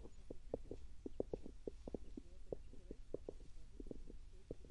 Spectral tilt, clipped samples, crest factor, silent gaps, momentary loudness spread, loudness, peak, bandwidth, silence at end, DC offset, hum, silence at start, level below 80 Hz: -7.5 dB/octave; under 0.1%; 26 dB; none; 11 LU; -54 LUFS; -24 dBFS; 11 kHz; 0 s; under 0.1%; none; 0 s; -56 dBFS